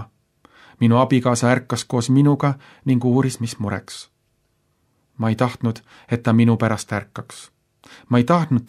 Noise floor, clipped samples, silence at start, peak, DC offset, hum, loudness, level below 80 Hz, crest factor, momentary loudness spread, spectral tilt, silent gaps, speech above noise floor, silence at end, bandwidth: -67 dBFS; under 0.1%; 0 s; -2 dBFS; under 0.1%; none; -19 LUFS; -60 dBFS; 18 dB; 17 LU; -6.5 dB/octave; none; 48 dB; 0.05 s; 12.5 kHz